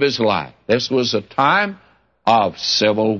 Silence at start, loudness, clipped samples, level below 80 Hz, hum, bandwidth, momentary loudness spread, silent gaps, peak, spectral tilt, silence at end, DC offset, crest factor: 0 s; -17 LUFS; under 0.1%; -58 dBFS; none; 7.4 kHz; 6 LU; none; -2 dBFS; -4 dB/octave; 0 s; under 0.1%; 16 dB